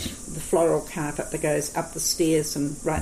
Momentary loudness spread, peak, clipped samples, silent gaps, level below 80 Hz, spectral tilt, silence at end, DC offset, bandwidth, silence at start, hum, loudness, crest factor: 8 LU; -10 dBFS; under 0.1%; none; -46 dBFS; -4 dB/octave; 0 s; under 0.1%; 15.5 kHz; 0 s; none; -25 LUFS; 14 dB